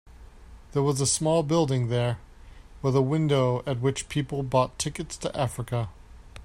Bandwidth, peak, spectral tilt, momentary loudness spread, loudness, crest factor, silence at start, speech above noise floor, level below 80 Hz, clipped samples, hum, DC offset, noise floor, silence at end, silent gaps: 15.5 kHz; -8 dBFS; -5.5 dB/octave; 9 LU; -26 LUFS; 18 dB; 0.05 s; 22 dB; -48 dBFS; under 0.1%; none; under 0.1%; -47 dBFS; 0 s; none